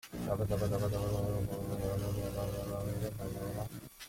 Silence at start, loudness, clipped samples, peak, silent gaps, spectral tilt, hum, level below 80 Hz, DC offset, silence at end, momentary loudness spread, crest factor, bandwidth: 0.05 s; -37 LUFS; under 0.1%; -20 dBFS; none; -6.5 dB/octave; 60 Hz at -45 dBFS; -48 dBFS; under 0.1%; 0 s; 6 LU; 16 dB; 16.5 kHz